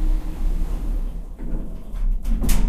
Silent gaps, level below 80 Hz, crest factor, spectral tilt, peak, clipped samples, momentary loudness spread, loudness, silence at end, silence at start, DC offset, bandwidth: none; -22 dBFS; 16 dB; -5.5 dB/octave; -4 dBFS; under 0.1%; 8 LU; -30 LUFS; 0 s; 0 s; under 0.1%; 15.5 kHz